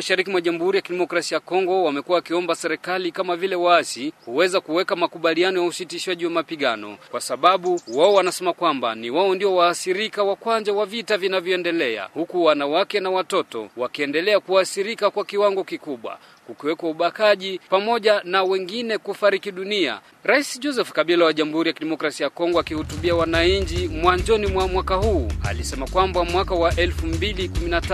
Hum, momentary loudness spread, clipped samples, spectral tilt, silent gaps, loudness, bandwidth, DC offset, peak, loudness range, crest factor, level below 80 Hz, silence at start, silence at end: none; 8 LU; under 0.1%; -4.5 dB/octave; none; -21 LUFS; 14 kHz; under 0.1%; -2 dBFS; 2 LU; 20 dB; -36 dBFS; 0 s; 0 s